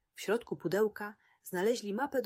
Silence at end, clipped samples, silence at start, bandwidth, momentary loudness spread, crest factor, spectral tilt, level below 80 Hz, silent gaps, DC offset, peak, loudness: 0 s; under 0.1%; 0.15 s; 16 kHz; 12 LU; 14 dB; -5 dB/octave; -76 dBFS; none; under 0.1%; -20 dBFS; -34 LUFS